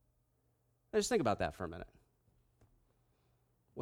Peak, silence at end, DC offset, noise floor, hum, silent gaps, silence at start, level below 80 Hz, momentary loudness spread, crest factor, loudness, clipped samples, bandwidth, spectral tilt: -20 dBFS; 0 s; under 0.1%; -77 dBFS; none; none; 0.95 s; -62 dBFS; 20 LU; 22 dB; -36 LUFS; under 0.1%; 16 kHz; -4.5 dB/octave